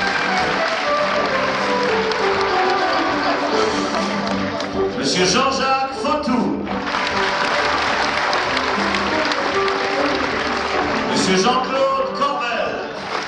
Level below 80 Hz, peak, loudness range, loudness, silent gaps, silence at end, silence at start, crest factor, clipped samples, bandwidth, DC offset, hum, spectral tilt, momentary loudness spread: -46 dBFS; -4 dBFS; 1 LU; -18 LUFS; none; 0 s; 0 s; 14 dB; under 0.1%; 11 kHz; under 0.1%; none; -3.5 dB/octave; 4 LU